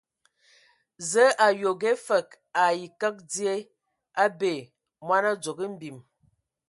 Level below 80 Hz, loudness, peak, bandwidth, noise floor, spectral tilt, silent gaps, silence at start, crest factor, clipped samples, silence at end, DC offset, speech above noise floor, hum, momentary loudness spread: -80 dBFS; -26 LUFS; -6 dBFS; 11.5 kHz; -69 dBFS; -3 dB/octave; none; 1 s; 20 dB; under 0.1%; 0.7 s; under 0.1%; 44 dB; none; 14 LU